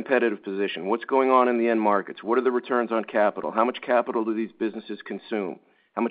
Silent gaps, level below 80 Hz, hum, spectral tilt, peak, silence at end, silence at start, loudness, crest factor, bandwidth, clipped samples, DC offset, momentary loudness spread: none; -76 dBFS; none; -9.5 dB/octave; -4 dBFS; 0 s; 0 s; -24 LUFS; 20 dB; 4.9 kHz; under 0.1%; under 0.1%; 12 LU